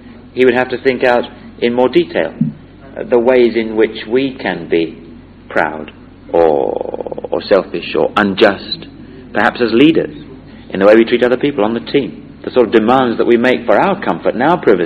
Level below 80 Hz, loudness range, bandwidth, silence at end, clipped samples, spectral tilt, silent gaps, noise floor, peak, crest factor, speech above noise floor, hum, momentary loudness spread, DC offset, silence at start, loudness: -44 dBFS; 4 LU; 7.2 kHz; 0 s; 0.3%; -7.5 dB/octave; none; -34 dBFS; 0 dBFS; 14 dB; 22 dB; none; 14 LU; under 0.1%; 0.05 s; -13 LUFS